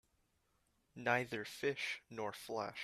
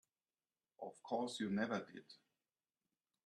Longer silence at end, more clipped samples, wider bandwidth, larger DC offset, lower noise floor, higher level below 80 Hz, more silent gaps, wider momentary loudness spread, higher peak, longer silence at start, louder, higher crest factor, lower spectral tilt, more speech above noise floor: second, 0 s vs 1.1 s; neither; first, 14.5 kHz vs 12 kHz; neither; second, -79 dBFS vs under -90 dBFS; first, -78 dBFS vs -84 dBFS; neither; second, 8 LU vs 20 LU; first, -18 dBFS vs -26 dBFS; first, 0.95 s vs 0.8 s; about the same, -41 LUFS vs -43 LUFS; about the same, 24 dB vs 20 dB; about the same, -4 dB/octave vs -5 dB/octave; second, 38 dB vs over 47 dB